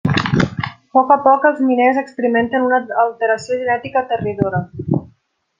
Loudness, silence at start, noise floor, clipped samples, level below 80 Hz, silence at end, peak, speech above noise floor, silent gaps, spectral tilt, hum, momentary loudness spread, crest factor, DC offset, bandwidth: -16 LUFS; 0.05 s; -58 dBFS; under 0.1%; -50 dBFS; 0.55 s; 0 dBFS; 42 dB; none; -7 dB/octave; none; 9 LU; 16 dB; under 0.1%; 9.2 kHz